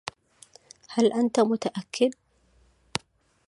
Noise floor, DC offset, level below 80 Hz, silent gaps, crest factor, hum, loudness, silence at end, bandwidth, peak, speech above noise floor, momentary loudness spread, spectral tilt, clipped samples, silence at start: -63 dBFS; under 0.1%; -66 dBFS; none; 22 dB; none; -26 LUFS; 1.35 s; 11.5 kHz; -6 dBFS; 39 dB; 12 LU; -4.5 dB/octave; under 0.1%; 0.9 s